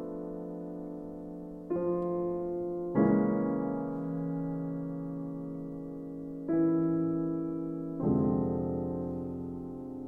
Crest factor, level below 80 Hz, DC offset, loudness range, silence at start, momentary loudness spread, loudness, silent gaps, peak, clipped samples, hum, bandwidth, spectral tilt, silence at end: 18 dB; -58 dBFS; under 0.1%; 3 LU; 0 s; 13 LU; -33 LUFS; none; -14 dBFS; under 0.1%; none; 2.6 kHz; -12 dB/octave; 0 s